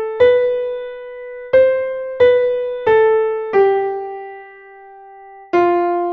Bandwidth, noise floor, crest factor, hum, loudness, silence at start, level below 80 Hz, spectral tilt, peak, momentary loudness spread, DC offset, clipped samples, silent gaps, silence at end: 5 kHz; -39 dBFS; 14 dB; none; -15 LUFS; 0 s; -54 dBFS; -7 dB/octave; -2 dBFS; 18 LU; under 0.1%; under 0.1%; none; 0 s